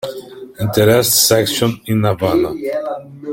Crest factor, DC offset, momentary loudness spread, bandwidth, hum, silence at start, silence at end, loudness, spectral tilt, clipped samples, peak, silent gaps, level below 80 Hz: 14 dB; under 0.1%; 17 LU; 17 kHz; none; 0.05 s; 0 s; -14 LUFS; -4 dB/octave; under 0.1%; 0 dBFS; none; -48 dBFS